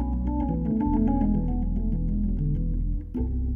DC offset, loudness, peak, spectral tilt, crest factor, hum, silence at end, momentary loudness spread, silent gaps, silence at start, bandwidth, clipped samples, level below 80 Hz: under 0.1%; -27 LUFS; -10 dBFS; -13 dB/octave; 14 dB; none; 0 s; 7 LU; none; 0 s; 2.3 kHz; under 0.1%; -28 dBFS